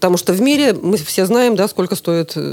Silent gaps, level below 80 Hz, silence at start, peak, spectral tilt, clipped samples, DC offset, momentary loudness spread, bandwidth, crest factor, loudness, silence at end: none; -62 dBFS; 0 s; 0 dBFS; -5 dB/octave; under 0.1%; under 0.1%; 5 LU; 19 kHz; 14 dB; -15 LUFS; 0 s